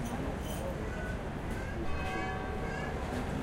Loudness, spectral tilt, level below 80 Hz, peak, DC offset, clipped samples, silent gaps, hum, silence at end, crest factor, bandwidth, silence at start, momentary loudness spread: -37 LUFS; -6 dB/octave; -42 dBFS; -22 dBFS; under 0.1%; under 0.1%; none; none; 0 s; 12 dB; 16 kHz; 0 s; 2 LU